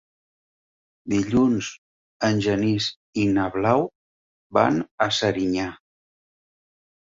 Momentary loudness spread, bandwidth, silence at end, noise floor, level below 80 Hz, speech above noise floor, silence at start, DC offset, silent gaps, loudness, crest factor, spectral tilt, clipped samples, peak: 7 LU; 7.8 kHz; 1.45 s; under -90 dBFS; -54 dBFS; over 68 dB; 1.05 s; under 0.1%; 1.78-2.20 s, 2.96-3.13 s, 3.95-4.50 s, 4.91-4.98 s; -23 LUFS; 22 dB; -5.5 dB/octave; under 0.1%; -4 dBFS